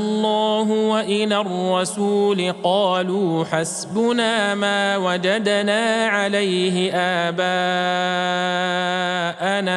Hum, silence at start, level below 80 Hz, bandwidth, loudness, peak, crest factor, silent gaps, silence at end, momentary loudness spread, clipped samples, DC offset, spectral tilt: none; 0 s; -70 dBFS; 12.5 kHz; -20 LUFS; -4 dBFS; 16 dB; none; 0 s; 3 LU; under 0.1%; under 0.1%; -4 dB/octave